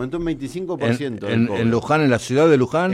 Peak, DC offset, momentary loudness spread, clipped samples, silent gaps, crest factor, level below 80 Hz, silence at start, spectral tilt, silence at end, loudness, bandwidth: -4 dBFS; under 0.1%; 10 LU; under 0.1%; none; 14 dB; -48 dBFS; 0 s; -6.5 dB/octave; 0 s; -19 LUFS; 13.5 kHz